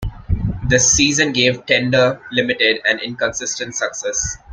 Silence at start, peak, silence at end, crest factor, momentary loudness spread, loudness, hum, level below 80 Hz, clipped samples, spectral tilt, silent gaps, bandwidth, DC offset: 0 s; 0 dBFS; 0 s; 18 dB; 10 LU; -16 LUFS; none; -34 dBFS; under 0.1%; -2.5 dB/octave; none; 10.5 kHz; under 0.1%